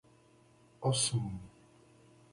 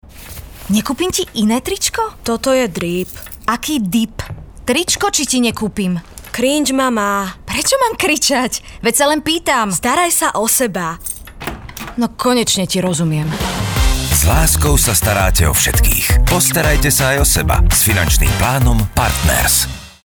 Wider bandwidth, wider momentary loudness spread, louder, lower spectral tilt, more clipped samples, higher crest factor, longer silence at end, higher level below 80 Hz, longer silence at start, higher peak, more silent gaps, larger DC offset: second, 11.5 kHz vs over 20 kHz; first, 18 LU vs 10 LU; second, -33 LUFS vs -14 LUFS; about the same, -4 dB/octave vs -3.5 dB/octave; neither; first, 20 dB vs 12 dB; first, 0.85 s vs 0.15 s; second, -62 dBFS vs -22 dBFS; first, 0.8 s vs 0.05 s; second, -18 dBFS vs -2 dBFS; neither; neither